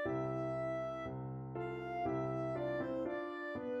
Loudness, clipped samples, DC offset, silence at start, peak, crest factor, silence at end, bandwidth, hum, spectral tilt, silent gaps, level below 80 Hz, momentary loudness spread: -40 LUFS; under 0.1%; under 0.1%; 0 s; -28 dBFS; 12 dB; 0 s; 8.2 kHz; none; -8.5 dB/octave; none; -64 dBFS; 5 LU